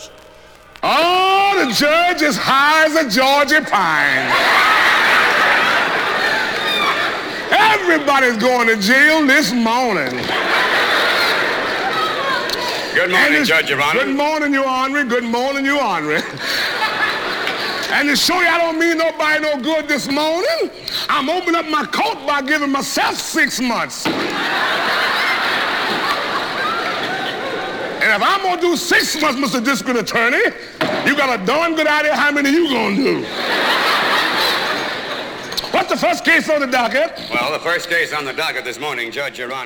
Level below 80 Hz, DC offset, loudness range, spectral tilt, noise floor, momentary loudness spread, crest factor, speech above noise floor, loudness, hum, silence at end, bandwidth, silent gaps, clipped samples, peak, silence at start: -54 dBFS; under 0.1%; 5 LU; -2.5 dB/octave; -42 dBFS; 8 LU; 14 dB; 26 dB; -15 LUFS; none; 0 s; over 20 kHz; none; under 0.1%; -2 dBFS; 0 s